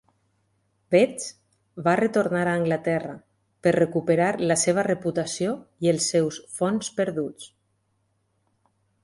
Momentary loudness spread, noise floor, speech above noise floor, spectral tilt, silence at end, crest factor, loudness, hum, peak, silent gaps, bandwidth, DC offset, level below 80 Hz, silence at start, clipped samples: 9 LU; -71 dBFS; 48 dB; -5 dB/octave; 1.55 s; 20 dB; -24 LUFS; none; -6 dBFS; none; 11.5 kHz; under 0.1%; -64 dBFS; 0.9 s; under 0.1%